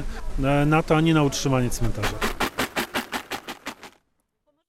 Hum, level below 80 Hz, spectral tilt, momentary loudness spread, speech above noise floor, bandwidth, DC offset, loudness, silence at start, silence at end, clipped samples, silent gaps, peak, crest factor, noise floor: none; -34 dBFS; -5 dB/octave; 16 LU; 51 dB; 16.5 kHz; under 0.1%; -24 LUFS; 0 s; 0.8 s; under 0.1%; none; -6 dBFS; 18 dB; -71 dBFS